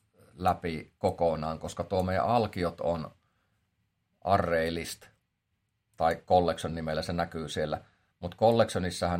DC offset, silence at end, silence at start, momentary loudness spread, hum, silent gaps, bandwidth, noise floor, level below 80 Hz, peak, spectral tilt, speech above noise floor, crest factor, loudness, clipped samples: under 0.1%; 0 s; 0.35 s; 11 LU; none; none; 16 kHz; -79 dBFS; -58 dBFS; -10 dBFS; -5.5 dB/octave; 50 dB; 20 dB; -30 LUFS; under 0.1%